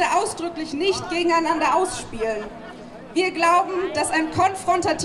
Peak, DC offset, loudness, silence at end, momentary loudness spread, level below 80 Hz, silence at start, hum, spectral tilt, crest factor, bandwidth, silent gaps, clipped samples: -6 dBFS; under 0.1%; -22 LUFS; 0 s; 11 LU; -50 dBFS; 0 s; none; -3.5 dB/octave; 16 dB; 13 kHz; none; under 0.1%